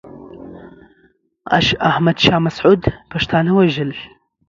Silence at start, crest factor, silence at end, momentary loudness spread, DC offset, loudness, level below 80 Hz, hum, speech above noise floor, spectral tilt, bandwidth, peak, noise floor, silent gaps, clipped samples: 0.05 s; 18 dB; 0.45 s; 22 LU; under 0.1%; -15 LUFS; -40 dBFS; none; 42 dB; -6 dB/octave; 7.4 kHz; 0 dBFS; -57 dBFS; none; under 0.1%